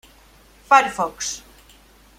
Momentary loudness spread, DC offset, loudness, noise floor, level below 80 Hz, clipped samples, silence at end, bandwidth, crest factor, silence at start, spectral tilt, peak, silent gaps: 13 LU; under 0.1%; -19 LUFS; -51 dBFS; -54 dBFS; under 0.1%; 0.8 s; 16 kHz; 22 dB; 0.7 s; -1.5 dB/octave; -2 dBFS; none